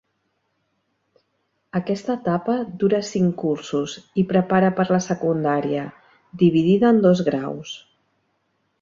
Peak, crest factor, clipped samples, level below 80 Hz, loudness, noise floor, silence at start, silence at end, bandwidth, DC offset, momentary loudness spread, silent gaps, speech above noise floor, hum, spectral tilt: -4 dBFS; 18 dB; under 0.1%; -60 dBFS; -21 LUFS; -71 dBFS; 1.75 s; 1.05 s; 7.6 kHz; under 0.1%; 12 LU; none; 52 dB; none; -7 dB/octave